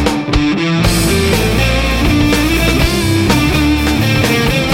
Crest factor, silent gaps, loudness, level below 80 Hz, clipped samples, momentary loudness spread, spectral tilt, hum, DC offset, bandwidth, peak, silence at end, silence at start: 12 dB; none; -12 LUFS; -20 dBFS; under 0.1%; 2 LU; -5 dB/octave; none; under 0.1%; 17 kHz; 0 dBFS; 0 s; 0 s